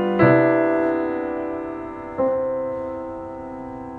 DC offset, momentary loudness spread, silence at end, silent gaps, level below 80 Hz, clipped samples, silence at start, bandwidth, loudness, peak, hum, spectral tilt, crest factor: under 0.1%; 17 LU; 0 s; none; -52 dBFS; under 0.1%; 0 s; 4.7 kHz; -22 LUFS; -4 dBFS; none; -9.5 dB/octave; 18 dB